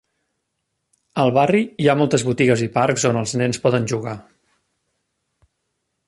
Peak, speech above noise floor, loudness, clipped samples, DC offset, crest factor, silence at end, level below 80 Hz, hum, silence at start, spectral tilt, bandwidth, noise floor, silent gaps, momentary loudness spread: -2 dBFS; 57 dB; -19 LUFS; under 0.1%; under 0.1%; 18 dB; 1.85 s; -56 dBFS; none; 1.15 s; -5.5 dB/octave; 11.5 kHz; -75 dBFS; none; 9 LU